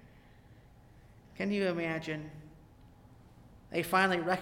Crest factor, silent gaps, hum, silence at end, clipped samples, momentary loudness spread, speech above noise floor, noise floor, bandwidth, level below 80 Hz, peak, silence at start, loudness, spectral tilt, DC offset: 22 dB; none; none; 0 s; under 0.1%; 14 LU; 26 dB; -58 dBFS; 16.5 kHz; -62 dBFS; -14 dBFS; 0 s; -32 LUFS; -5.5 dB/octave; under 0.1%